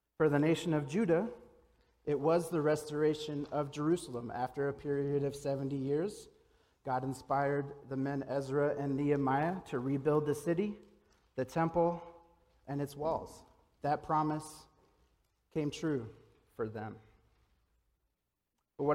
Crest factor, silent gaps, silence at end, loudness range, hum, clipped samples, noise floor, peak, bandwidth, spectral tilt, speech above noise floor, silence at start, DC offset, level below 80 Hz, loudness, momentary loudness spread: 18 dB; none; 0 s; 8 LU; none; under 0.1%; -86 dBFS; -18 dBFS; 16 kHz; -7 dB/octave; 52 dB; 0.2 s; under 0.1%; -66 dBFS; -35 LUFS; 12 LU